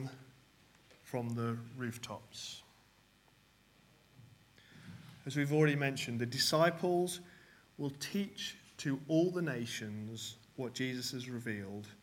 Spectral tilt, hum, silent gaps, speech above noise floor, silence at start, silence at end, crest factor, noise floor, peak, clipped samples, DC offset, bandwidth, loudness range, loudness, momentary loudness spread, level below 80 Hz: -5 dB/octave; none; none; 31 dB; 0 s; 0.05 s; 22 dB; -67 dBFS; -16 dBFS; under 0.1%; under 0.1%; 16.5 kHz; 14 LU; -37 LUFS; 16 LU; -76 dBFS